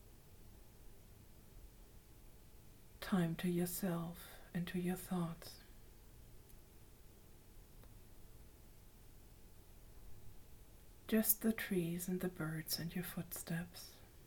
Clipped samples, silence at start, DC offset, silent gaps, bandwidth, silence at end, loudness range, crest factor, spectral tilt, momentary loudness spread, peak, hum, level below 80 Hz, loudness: under 0.1%; 0 s; under 0.1%; none; 19 kHz; 0 s; 23 LU; 26 dB; -5 dB/octave; 25 LU; -18 dBFS; none; -62 dBFS; -41 LUFS